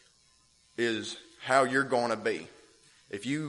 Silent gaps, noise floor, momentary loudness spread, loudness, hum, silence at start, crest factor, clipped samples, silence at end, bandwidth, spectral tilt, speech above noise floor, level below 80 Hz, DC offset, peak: none; -65 dBFS; 17 LU; -30 LUFS; none; 0.8 s; 22 dB; under 0.1%; 0 s; 11.5 kHz; -4 dB/octave; 36 dB; -74 dBFS; under 0.1%; -8 dBFS